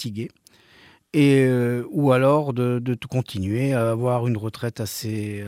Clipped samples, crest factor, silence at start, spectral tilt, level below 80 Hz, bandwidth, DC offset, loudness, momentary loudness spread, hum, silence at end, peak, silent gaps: under 0.1%; 16 dB; 0 s; -7 dB/octave; -60 dBFS; 16 kHz; under 0.1%; -22 LUFS; 12 LU; none; 0 s; -6 dBFS; none